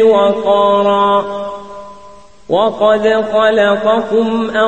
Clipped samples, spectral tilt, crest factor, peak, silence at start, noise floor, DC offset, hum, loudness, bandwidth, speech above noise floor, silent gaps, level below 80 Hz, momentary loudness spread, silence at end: under 0.1%; -5.5 dB/octave; 12 dB; 0 dBFS; 0 s; -40 dBFS; 0.9%; none; -12 LUFS; 8.6 kHz; 28 dB; none; -50 dBFS; 13 LU; 0 s